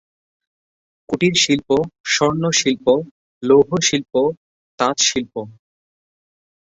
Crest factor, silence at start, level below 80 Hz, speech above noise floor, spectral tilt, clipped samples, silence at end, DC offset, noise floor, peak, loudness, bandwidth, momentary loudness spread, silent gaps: 18 dB; 1.1 s; -54 dBFS; over 73 dB; -3.5 dB/octave; under 0.1%; 1.15 s; under 0.1%; under -90 dBFS; -2 dBFS; -17 LUFS; 8.2 kHz; 13 LU; 2.00-2.04 s, 3.11-3.41 s, 4.37-4.78 s